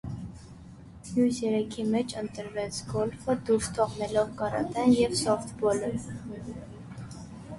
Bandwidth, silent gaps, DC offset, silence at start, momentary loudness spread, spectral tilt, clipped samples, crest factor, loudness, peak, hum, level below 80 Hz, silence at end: 11.5 kHz; none; under 0.1%; 0.05 s; 19 LU; -5.5 dB/octave; under 0.1%; 18 dB; -29 LUFS; -10 dBFS; none; -52 dBFS; 0 s